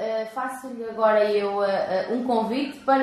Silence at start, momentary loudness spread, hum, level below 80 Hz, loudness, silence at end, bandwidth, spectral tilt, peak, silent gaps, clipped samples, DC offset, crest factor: 0 s; 11 LU; none; -68 dBFS; -24 LUFS; 0 s; 13 kHz; -5.5 dB/octave; -8 dBFS; none; under 0.1%; under 0.1%; 16 dB